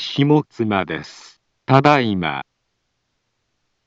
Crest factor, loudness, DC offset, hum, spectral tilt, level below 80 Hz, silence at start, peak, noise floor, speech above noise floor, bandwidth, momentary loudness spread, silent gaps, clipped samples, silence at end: 20 dB; -17 LUFS; under 0.1%; none; -7 dB/octave; -58 dBFS; 0 s; 0 dBFS; -72 dBFS; 55 dB; 7.8 kHz; 16 LU; none; under 0.1%; 1.45 s